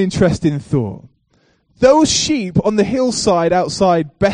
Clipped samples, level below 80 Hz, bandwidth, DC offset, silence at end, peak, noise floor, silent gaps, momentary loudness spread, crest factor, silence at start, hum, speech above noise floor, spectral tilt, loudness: under 0.1%; -40 dBFS; 10 kHz; under 0.1%; 0 s; 0 dBFS; -58 dBFS; none; 7 LU; 16 dB; 0 s; none; 44 dB; -5 dB/octave; -15 LUFS